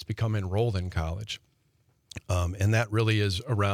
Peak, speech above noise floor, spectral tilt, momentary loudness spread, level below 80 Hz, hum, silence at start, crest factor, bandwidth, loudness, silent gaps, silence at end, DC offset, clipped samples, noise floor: -12 dBFS; 41 dB; -6 dB/octave; 13 LU; -50 dBFS; none; 0 s; 16 dB; 14.5 kHz; -28 LUFS; none; 0 s; under 0.1%; under 0.1%; -68 dBFS